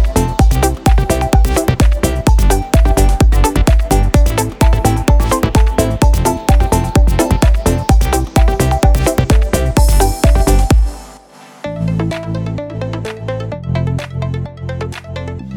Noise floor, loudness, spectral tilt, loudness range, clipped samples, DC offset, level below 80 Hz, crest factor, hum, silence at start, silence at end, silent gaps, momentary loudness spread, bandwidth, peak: -39 dBFS; -14 LUFS; -6 dB/octave; 8 LU; under 0.1%; under 0.1%; -14 dBFS; 12 dB; none; 0 s; 0 s; none; 10 LU; 17.5 kHz; 0 dBFS